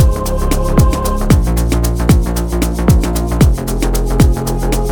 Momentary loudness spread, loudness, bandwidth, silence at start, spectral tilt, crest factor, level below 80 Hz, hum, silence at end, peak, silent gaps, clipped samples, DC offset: 4 LU; -14 LUFS; 19.5 kHz; 0 s; -6 dB/octave; 12 dB; -14 dBFS; none; 0 s; 0 dBFS; none; under 0.1%; under 0.1%